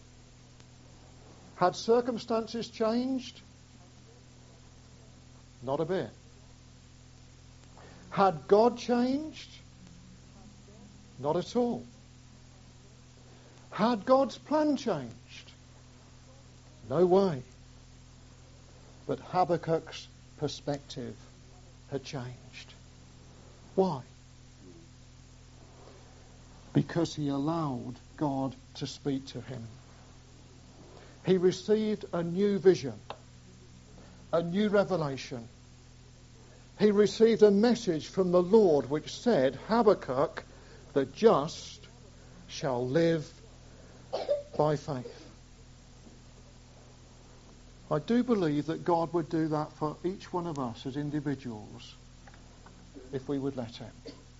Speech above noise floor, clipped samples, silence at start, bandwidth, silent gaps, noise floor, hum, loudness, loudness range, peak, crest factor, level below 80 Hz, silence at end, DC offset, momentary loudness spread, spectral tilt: 26 dB; under 0.1%; 1.25 s; 7.6 kHz; none; -54 dBFS; none; -30 LUFS; 11 LU; -8 dBFS; 24 dB; -60 dBFS; 0.25 s; under 0.1%; 22 LU; -6 dB/octave